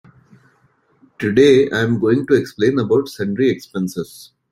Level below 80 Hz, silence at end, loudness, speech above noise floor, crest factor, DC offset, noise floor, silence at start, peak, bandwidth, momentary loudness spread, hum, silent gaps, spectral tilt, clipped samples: -56 dBFS; 0.25 s; -17 LUFS; 42 dB; 16 dB; under 0.1%; -59 dBFS; 1.2 s; -2 dBFS; 15.5 kHz; 13 LU; none; none; -6.5 dB/octave; under 0.1%